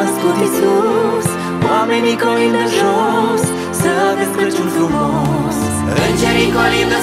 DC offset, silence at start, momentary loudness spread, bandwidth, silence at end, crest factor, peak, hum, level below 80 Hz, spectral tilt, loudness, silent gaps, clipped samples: under 0.1%; 0 s; 4 LU; 16 kHz; 0 s; 14 dB; 0 dBFS; none; -38 dBFS; -5 dB/octave; -14 LUFS; none; under 0.1%